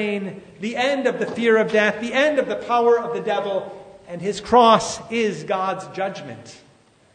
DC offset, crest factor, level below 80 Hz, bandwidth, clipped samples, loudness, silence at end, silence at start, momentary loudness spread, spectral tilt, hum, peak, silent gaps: under 0.1%; 20 dB; -58 dBFS; 9.6 kHz; under 0.1%; -20 LUFS; 0.6 s; 0 s; 17 LU; -4 dB/octave; none; 0 dBFS; none